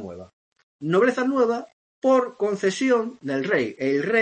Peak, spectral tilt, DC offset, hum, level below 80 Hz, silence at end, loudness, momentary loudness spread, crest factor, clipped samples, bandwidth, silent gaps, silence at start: -8 dBFS; -5.5 dB/octave; under 0.1%; none; -70 dBFS; 0 s; -23 LUFS; 9 LU; 16 dB; under 0.1%; 8.8 kHz; 0.33-0.52 s, 0.63-0.79 s, 1.73-2.02 s; 0 s